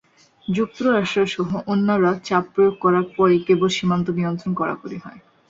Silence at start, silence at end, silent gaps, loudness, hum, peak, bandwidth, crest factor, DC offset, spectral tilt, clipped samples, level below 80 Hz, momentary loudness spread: 0.5 s; 0.3 s; none; -20 LUFS; none; -4 dBFS; 7.8 kHz; 16 dB; under 0.1%; -6.5 dB/octave; under 0.1%; -58 dBFS; 8 LU